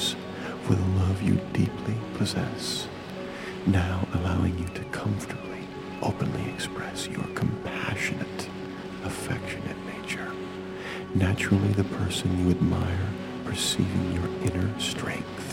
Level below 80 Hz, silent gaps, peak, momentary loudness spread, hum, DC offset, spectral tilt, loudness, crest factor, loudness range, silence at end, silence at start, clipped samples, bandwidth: -48 dBFS; none; -8 dBFS; 11 LU; none; under 0.1%; -5.5 dB/octave; -29 LUFS; 20 dB; 5 LU; 0 s; 0 s; under 0.1%; 16 kHz